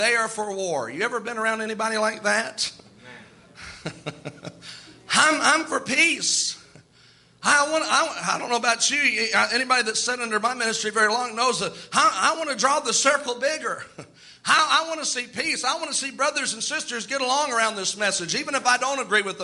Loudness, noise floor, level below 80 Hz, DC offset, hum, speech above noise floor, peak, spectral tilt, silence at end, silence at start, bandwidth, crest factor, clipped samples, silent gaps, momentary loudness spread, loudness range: -22 LUFS; -55 dBFS; -68 dBFS; under 0.1%; none; 32 dB; -4 dBFS; -1 dB/octave; 0 s; 0 s; 11.5 kHz; 20 dB; under 0.1%; none; 14 LU; 5 LU